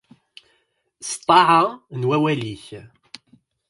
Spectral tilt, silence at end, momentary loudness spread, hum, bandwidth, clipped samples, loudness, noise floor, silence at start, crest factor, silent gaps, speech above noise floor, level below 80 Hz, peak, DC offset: -4.5 dB/octave; 0.85 s; 21 LU; none; 11.5 kHz; under 0.1%; -18 LUFS; -67 dBFS; 1 s; 20 dB; none; 48 dB; -62 dBFS; -2 dBFS; under 0.1%